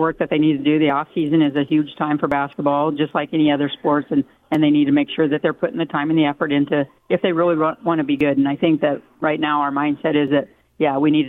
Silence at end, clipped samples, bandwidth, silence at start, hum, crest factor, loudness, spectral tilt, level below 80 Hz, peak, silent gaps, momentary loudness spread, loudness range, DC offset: 0 s; under 0.1%; 4 kHz; 0 s; none; 14 dB; -19 LUFS; -8.5 dB/octave; -58 dBFS; -4 dBFS; none; 5 LU; 1 LU; under 0.1%